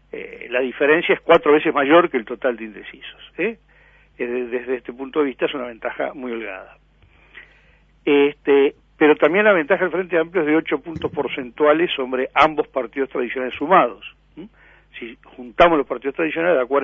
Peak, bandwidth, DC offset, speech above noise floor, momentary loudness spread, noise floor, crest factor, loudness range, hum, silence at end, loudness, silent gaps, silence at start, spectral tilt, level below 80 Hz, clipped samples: 0 dBFS; 6.2 kHz; under 0.1%; 35 dB; 19 LU; -54 dBFS; 20 dB; 8 LU; none; 0 s; -19 LUFS; none; 0.15 s; -7 dB/octave; -52 dBFS; under 0.1%